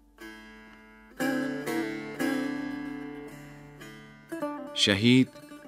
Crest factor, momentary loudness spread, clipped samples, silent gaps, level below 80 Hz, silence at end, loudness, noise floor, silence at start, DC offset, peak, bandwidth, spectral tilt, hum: 24 dB; 24 LU; under 0.1%; none; -64 dBFS; 0 s; -28 LUFS; -52 dBFS; 0.2 s; under 0.1%; -6 dBFS; 16 kHz; -4.5 dB/octave; none